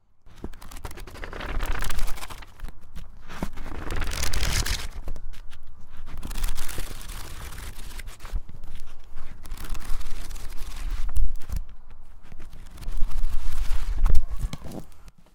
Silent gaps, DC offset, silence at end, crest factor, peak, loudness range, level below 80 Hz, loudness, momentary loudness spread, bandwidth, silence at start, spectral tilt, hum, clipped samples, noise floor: none; under 0.1%; 0.3 s; 20 dB; 0 dBFS; 8 LU; -28 dBFS; -34 LUFS; 18 LU; 16 kHz; 0.25 s; -3.5 dB/octave; none; under 0.1%; -40 dBFS